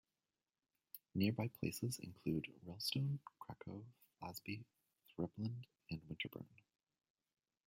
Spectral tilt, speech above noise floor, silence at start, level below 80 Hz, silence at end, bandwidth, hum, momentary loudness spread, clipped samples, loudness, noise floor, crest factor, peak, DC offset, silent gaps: -5.5 dB/octave; over 45 dB; 0.95 s; -76 dBFS; 1.2 s; 16 kHz; none; 16 LU; under 0.1%; -45 LUFS; under -90 dBFS; 22 dB; -26 dBFS; under 0.1%; none